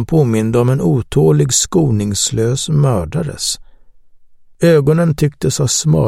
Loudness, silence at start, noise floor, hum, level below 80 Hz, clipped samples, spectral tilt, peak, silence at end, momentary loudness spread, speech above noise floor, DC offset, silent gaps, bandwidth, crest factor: -14 LUFS; 0 s; -41 dBFS; none; -38 dBFS; under 0.1%; -5.5 dB/octave; 0 dBFS; 0 s; 7 LU; 28 dB; under 0.1%; none; 15.5 kHz; 14 dB